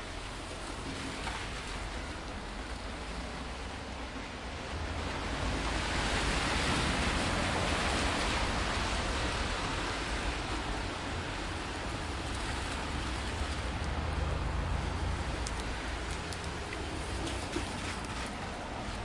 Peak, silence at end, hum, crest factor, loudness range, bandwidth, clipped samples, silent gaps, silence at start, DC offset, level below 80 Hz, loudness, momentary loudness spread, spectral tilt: -14 dBFS; 0 s; none; 20 dB; 8 LU; 11.5 kHz; under 0.1%; none; 0 s; under 0.1%; -40 dBFS; -35 LUFS; 10 LU; -4 dB/octave